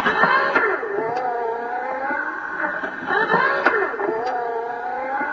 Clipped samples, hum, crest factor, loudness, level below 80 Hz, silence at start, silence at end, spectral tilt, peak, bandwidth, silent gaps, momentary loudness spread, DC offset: under 0.1%; none; 20 dB; -21 LUFS; -60 dBFS; 0 s; 0 s; -5.5 dB/octave; -2 dBFS; 7.6 kHz; none; 9 LU; under 0.1%